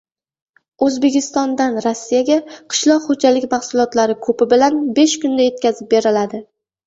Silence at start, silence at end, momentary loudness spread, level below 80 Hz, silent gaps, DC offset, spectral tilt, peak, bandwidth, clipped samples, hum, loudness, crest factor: 0.8 s; 0.45 s; 5 LU; -60 dBFS; none; under 0.1%; -3.5 dB/octave; -2 dBFS; 8 kHz; under 0.1%; none; -16 LUFS; 14 dB